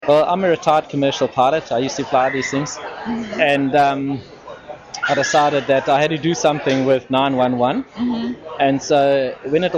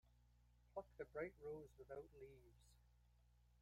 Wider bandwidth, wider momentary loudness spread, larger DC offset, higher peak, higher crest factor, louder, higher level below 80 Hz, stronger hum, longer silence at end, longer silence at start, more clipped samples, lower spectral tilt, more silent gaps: second, 9.4 kHz vs 15 kHz; about the same, 11 LU vs 12 LU; neither; first, -2 dBFS vs -38 dBFS; about the same, 16 dB vs 20 dB; first, -18 LUFS vs -56 LUFS; first, -54 dBFS vs -74 dBFS; second, none vs 60 Hz at -75 dBFS; about the same, 0 s vs 0 s; about the same, 0 s vs 0.05 s; neither; second, -5 dB/octave vs -7 dB/octave; neither